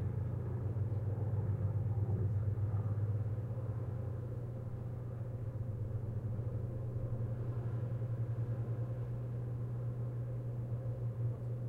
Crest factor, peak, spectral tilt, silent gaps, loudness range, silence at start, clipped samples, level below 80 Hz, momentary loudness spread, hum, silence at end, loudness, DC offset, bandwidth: 12 dB; -24 dBFS; -11 dB/octave; none; 4 LU; 0 s; under 0.1%; -54 dBFS; 6 LU; none; 0 s; -39 LUFS; under 0.1%; 2.8 kHz